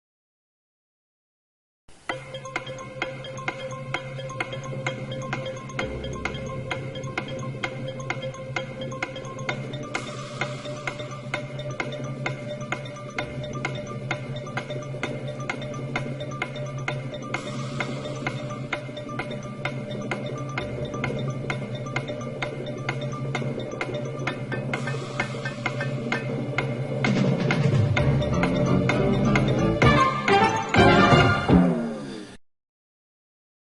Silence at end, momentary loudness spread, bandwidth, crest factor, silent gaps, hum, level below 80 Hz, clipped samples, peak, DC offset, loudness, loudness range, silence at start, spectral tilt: 1.3 s; 13 LU; 11.5 kHz; 22 dB; none; none; -46 dBFS; under 0.1%; -4 dBFS; under 0.1%; -27 LUFS; 12 LU; 1.9 s; -6 dB/octave